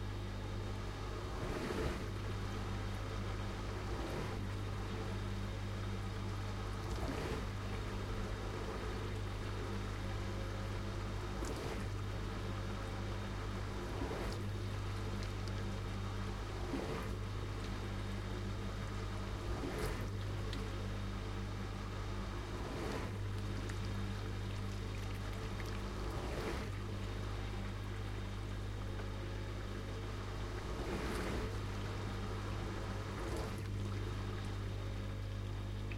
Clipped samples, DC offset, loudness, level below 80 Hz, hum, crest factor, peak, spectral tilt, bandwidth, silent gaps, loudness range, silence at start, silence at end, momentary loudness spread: under 0.1%; under 0.1%; -43 LUFS; -46 dBFS; none; 16 dB; -24 dBFS; -6 dB/octave; 16 kHz; none; 1 LU; 0 s; 0 s; 3 LU